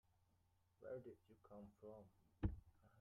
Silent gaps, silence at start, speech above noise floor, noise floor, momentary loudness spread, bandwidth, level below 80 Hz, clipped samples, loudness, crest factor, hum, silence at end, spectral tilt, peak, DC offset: none; 0.8 s; 20 dB; -81 dBFS; 15 LU; 3.7 kHz; -62 dBFS; under 0.1%; -55 LUFS; 26 dB; none; 0 s; -8.5 dB/octave; -28 dBFS; under 0.1%